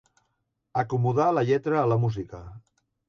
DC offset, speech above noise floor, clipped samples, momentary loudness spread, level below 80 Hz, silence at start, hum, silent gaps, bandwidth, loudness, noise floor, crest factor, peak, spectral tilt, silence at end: under 0.1%; 53 dB; under 0.1%; 13 LU; -56 dBFS; 0.75 s; none; none; 7 kHz; -25 LUFS; -77 dBFS; 16 dB; -10 dBFS; -8.5 dB/octave; 0.5 s